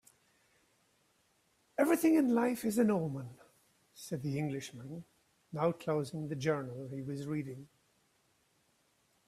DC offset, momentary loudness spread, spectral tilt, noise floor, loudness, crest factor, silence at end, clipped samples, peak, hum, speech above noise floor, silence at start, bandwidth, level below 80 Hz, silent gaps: under 0.1%; 18 LU; -6.5 dB/octave; -74 dBFS; -34 LUFS; 20 dB; 1.6 s; under 0.1%; -16 dBFS; none; 40 dB; 1.8 s; 15.5 kHz; -74 dBFS; none